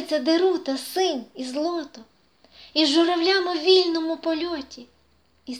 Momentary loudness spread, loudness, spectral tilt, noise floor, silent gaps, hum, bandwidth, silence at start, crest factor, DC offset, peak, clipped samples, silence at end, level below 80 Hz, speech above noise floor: 13 LU; -22 LUFS; -2 dB/octave; -63 dBFS; none; none; 14.5 kHz; 0 s; 18 dB; under 0.1%; -4 dBFS; under 0.1%; 0 s; -66 dBFS; 40 dB